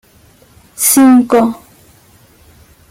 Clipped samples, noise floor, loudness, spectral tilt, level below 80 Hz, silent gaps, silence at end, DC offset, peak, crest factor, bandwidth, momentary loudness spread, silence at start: under 0.1%; -46 dBFS; -9 LUFS; -3 dB/octave; -52 dBFS; none; 1.35 s; under 0.1%; 0 dBFS; 14 dB; 17 kHz; 11 LU; 0.8 s